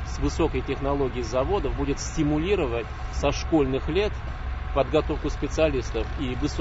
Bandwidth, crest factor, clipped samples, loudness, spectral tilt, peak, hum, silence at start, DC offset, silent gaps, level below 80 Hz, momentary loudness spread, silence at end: 8 kHz; 18 dB; under 0.1%; -26 LUFS; -6 dB/octave; -8 dBFS; none; 0 s; under 0.1%; none; -32 dBFS; 6 LU; 0 s